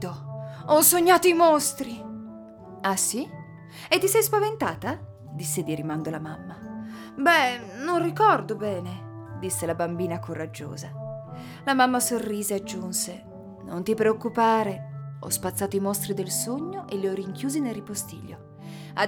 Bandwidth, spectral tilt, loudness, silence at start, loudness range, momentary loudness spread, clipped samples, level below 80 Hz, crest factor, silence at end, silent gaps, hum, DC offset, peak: over 20 kHz; -3.5 dB/octave; -24 LUFS; 0 s; 6 LU; 19 LU; under 0.1%; -62 dBFS; 22 dB; 0 s; none; none; under 0.1%; -4 dBFS